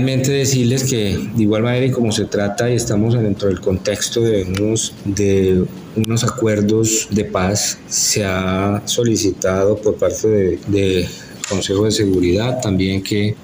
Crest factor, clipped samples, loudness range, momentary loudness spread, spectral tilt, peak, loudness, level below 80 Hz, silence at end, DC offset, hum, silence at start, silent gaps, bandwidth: 12 dB; under 0.1%; 1 LU; 4 LU; -5 dB/octave; -4 dBFS; -17 LUFS; -42 dBFS; 0 s; under 0.1%; none; 0 s; none; 16 kHz